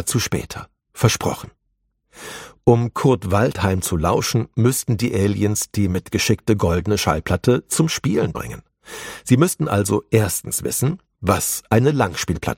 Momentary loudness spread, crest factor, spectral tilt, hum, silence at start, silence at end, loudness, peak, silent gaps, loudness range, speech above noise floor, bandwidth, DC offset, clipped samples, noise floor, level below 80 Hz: 15 LU; 18 dB; -5 dB/octave; none; 0 s; 0.05 s; -19 LUFS; 0 dBFS; none; 2 LU; 51 dB; 16.5 kHz; under 0.1%; under 0.1%; -70 dBFS; -42 dBFS